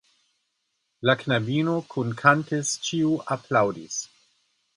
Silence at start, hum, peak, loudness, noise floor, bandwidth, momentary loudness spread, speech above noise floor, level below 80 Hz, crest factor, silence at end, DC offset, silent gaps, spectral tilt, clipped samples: 1 s; none; -4 dBFS; -24 LUFS; -76 dBFS; 11.5 kHz; 11 LU; 52 dB; -66 dBFS; 22 dB; 0.7 s; under 0.1%; none; -4.5 dB/octave; under 0.1%